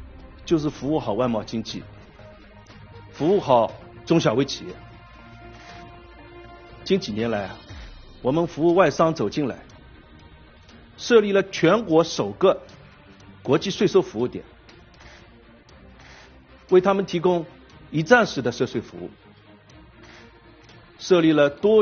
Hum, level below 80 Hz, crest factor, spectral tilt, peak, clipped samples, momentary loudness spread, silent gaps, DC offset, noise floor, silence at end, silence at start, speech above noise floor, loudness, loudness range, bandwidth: none; -52 dBFS; 22 dB; -5 dB/octave; -2 dBFS; under 0.1%; 22 LU; none; under 0.1%; -50 dBFS; 0 s; 0 s; 29 dB; -21 LUFS; 6 LU; 6.8 kHz